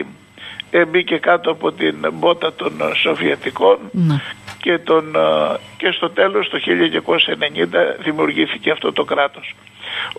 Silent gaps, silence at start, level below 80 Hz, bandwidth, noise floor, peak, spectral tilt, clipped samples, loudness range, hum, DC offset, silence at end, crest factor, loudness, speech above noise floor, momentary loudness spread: none; 0 s; -64 dBFS; 11.5 kHz; -37 dBFS; -2 dBFS; -6 dB/octave; under 0.1%; 1 LU; none; under 0.1%; 0.05 s; 16 dB; -17 LUFS; 20 dB; 9 LU